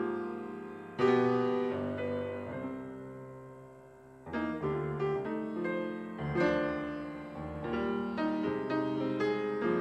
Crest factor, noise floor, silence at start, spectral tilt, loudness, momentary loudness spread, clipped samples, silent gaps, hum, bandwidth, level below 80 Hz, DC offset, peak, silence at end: 18 dB; -54 dBFS; 0 s; -8 dB/octave; -34 LUFS; 16 LU; under 0.1%; none; none; 8.6 kHz; -60 dBFS; under 0.1%; -14 dBFS; 0 s